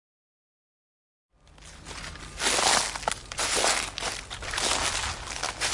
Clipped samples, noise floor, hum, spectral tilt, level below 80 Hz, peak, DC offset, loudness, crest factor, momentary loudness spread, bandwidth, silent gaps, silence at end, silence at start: under 0.1%; -50 dBFS; none; -0.5 dB/octave; -48 dBFS; -8 dBFS; under 0.1%; -26 LUFS; 22 dB; 16 LU; 11.5 kHz; none; 0 s; 1.55 s